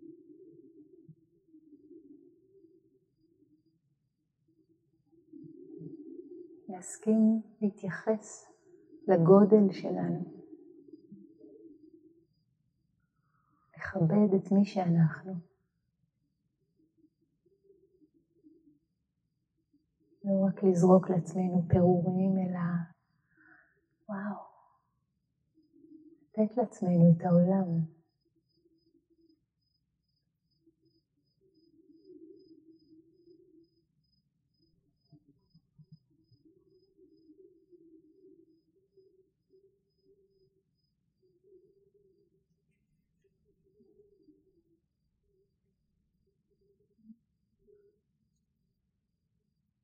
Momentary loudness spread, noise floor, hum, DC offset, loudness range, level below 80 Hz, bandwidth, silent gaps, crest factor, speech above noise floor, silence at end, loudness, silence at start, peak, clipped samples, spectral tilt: 24 LU; -81 dBFS; none; under 0.1%; 19 LU; -68 dBFS; 9.4 kHz; none; 26 dB; 55 dB; 21.95 s; -28 LUFS; 0.1 s; -8 dBFS; under 0.1%; -9 dB/octave